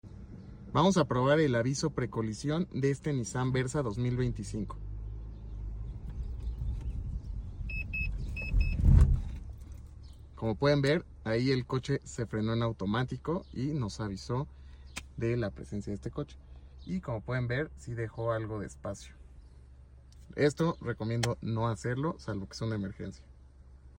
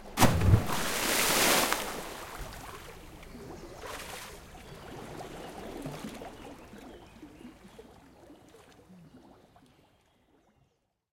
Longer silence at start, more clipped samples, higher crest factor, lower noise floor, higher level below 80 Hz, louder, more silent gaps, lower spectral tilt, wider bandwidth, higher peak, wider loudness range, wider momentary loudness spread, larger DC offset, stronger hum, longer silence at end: about the same, 0.05 s vs 0 s; neither; about the same, 22 dB vs 26 dB; second, -54 dBFS vs -74 dBFS; first, -38 dBFS vs -48 dBFS; second, -33 LUFS vs -29 LUFS; neither; first, -6.5 dB/octave vs -3.5 dB/octave; about the same, 16 kHz vs 16.5 kHz; about the same, -10 dBFS vs -8 dBFS; second, 8 LU vs 24 LU; second, 18 LU vs 26 LU; neither; neither; second, 0.05 s vs 1.95 s